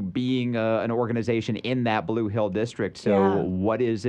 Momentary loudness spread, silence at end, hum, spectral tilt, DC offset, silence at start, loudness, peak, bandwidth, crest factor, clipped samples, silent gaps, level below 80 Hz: 5 LU; 0 s; none; -7.5 dB/octave; under 0.1%; 0 s; -25 LUFS; -10 dBFS; 9.4 kHz; 14 dB; under 0.1%; none; -60 dBFS